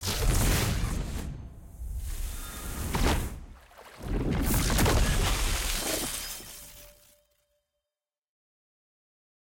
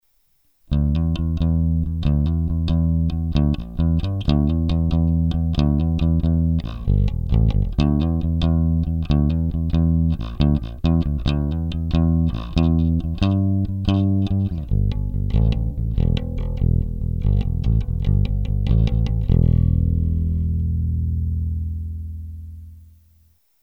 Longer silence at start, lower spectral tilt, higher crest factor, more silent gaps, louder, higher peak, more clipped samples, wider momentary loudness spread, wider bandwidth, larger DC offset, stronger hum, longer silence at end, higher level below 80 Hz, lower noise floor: second, 0 s vs 0.7 s; second, -4 dB/octave vs -9.5 dB/octave; about the same, 16 dB vs 16 dB; neither; second, -30 LUFS vs -21 LUFS; second, -14 dBFS vs -4 dBFS; neither; first, 20 LU vs 5 LU; first, 17 kHz vs 6 kHz; neither; neither; first, 2.6 s vs 0.8 s; second, -34 dBFS vs -24 dBFS; first, under -90 dBFS vs -64 dBFS